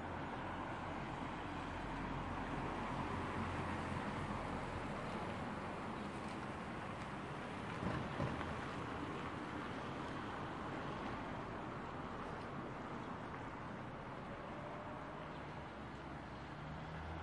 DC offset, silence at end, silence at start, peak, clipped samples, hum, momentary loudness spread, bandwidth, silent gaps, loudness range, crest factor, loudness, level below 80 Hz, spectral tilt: under 0.1%; 0 s; 0 s; -26 dBFS; under 0.1%; none; 6 LU; 11.5 kHz; none; 5 LU; 20 dB; -45 LUFS; -60 dBFS; -6.5 dB/octave